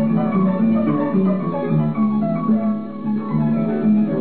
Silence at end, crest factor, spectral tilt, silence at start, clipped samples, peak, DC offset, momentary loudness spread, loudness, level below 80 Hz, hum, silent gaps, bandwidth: 0 s; 10 dB; -13 dB/octave; 0 s; under 0.1%; -8 dBFS; 1%; 5 LU; -19 LUFS; -54 dBFS; none; none; 4.3 kHz